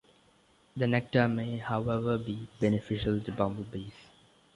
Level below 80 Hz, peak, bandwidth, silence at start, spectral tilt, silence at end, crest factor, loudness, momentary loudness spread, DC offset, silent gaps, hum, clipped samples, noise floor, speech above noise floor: -54 dBFS; -12 dBFS; 11 kHz; 0.75 s; -8 dB/octave; 0.55 s; 20 dB; -31 LUFS; 13 LU; under 0.1%; none; none; under 0.1%; -64 dBFS; 34 dB